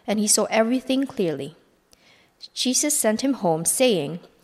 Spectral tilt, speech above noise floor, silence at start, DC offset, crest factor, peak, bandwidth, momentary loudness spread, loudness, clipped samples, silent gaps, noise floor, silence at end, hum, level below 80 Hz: -3 dB/octave; 36 dB; 0.05 s; under 0.1%; 18 dB; -6 dBFS; 16 kHz; 12 LU; -21 LUFS; under 0.1%; none; -58 dBFS; 0.2 s; none; -66 dBFS